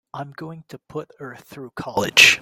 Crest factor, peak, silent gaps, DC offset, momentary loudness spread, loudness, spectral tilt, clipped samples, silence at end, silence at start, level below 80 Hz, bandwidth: 22 dB; 0 dBFS; none; under 0.1%; 26 LU; -15 LUFS; -1 dB/octave; under 0.1%; 0 s; 0.15 s; -60 dBFS; 17 kHz